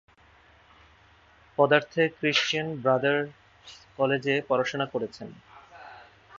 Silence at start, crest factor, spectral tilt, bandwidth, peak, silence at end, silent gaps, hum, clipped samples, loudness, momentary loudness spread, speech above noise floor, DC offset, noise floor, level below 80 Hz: 1.6 s; 24 dB; -4.5 dB/octave; 7.6 kHz; -6 dBFS; 0.35 s; none; none; under 0.1%; -26 LUFS; 24 LU; 32 dB; under 0.1%; -58 dBFS; -66 dBFS